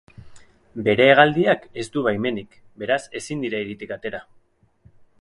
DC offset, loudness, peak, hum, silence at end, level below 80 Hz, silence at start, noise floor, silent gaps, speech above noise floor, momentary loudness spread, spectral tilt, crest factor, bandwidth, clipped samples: under 0.1%; -21 LUFS; 0 dBFS; none; 1 s; -58 dBFS; 0.25 s; -58 dBFS; none; 38 dB; 18 LU; -5.5 dB/octave; 22 dB; 11.5 kHz; under 0.1%